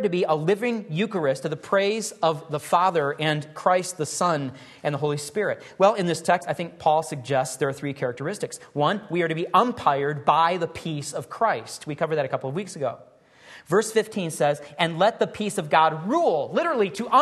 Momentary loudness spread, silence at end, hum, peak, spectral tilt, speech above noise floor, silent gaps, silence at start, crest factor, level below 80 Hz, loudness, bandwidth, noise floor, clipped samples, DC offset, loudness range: 10 LU; 0 s; none; -4 dBFS; -5 dB/octave; 25 dB; none; 0 s; 20 dB; -66 dBFS; -24 LUFS; 12.5 kHz; -49 dBFS; under 0.1%; under 0.1%; 3 LU